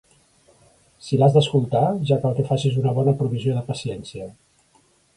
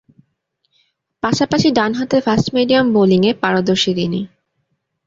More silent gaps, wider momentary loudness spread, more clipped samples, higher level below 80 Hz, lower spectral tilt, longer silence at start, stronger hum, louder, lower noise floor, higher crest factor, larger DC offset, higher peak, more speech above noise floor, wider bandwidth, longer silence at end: neither; first, 18 LU vs 8 LU; neither; second, -56 dBFS vs -50 dBFS; first, -7.5 dB/octave vs -5.5 dB/octave; second, 1.05 s vs 1.25 s; neither; second, -21 LUFS vs -15 LUFS; second, -60 dBFS vs -69 dBFS; about the same, 18 dB vs 16 dB; neither; second, -4 dBFS vs 0 dBFS; second, 40 dB vs 55 dB; first, 11 kHz vs 7.8 kHz; about the same, 0.85 s vs 0.8 s